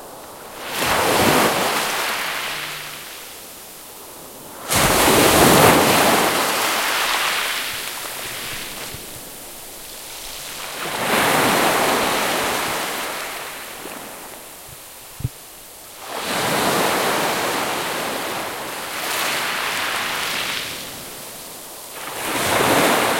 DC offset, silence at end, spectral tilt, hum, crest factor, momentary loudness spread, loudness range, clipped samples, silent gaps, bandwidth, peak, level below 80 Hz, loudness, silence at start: under 0.1%; 0 s; -2.5 dB/octave; none; 22 dB; 20 LU; 11 LU; under 0.1%; none; 16.5 kHz; 0 dBFS; -46 dBFS; -19 LUFS; 0 s